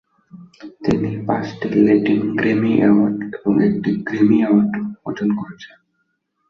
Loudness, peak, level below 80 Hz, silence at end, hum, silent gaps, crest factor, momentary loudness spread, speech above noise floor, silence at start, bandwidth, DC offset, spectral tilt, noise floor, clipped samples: -18 LUFS; -2 dBFS; -54 dBFS; 0.85 s; none; none; 16 dB; 11 LU; 52 dB; 0.35 s; 6.6 kHz; under 0.1%; -8.5 dB/octave; -70 dBFS; under 0.1%